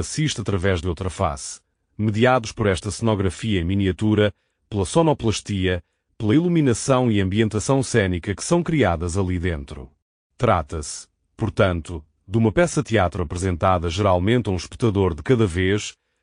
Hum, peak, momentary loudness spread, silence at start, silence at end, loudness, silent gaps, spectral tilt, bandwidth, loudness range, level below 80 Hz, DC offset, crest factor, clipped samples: none; -4 dBFS; 11 LU; 0 s; 0.3 s; -21 LUFS; 10.02-10.30 s; -6 dB/octave; 10.5 kHz; 3 LU; -40 dBFS; under 0.1%; 16 dB; under 0.1%